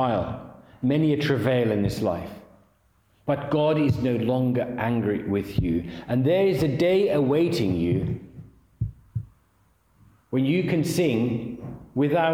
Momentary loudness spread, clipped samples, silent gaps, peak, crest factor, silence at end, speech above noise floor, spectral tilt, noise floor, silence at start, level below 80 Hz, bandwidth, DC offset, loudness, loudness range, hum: 13 LU; under 0.1%; none; -10 dBFS; 16 dB; 0 s; 40 dB; -7.5 dB/octave; -63 dBFS; 0 s; -48 dBFS; 16.5 kHz; under 0.1%; -24 LUFS; 5 LU; none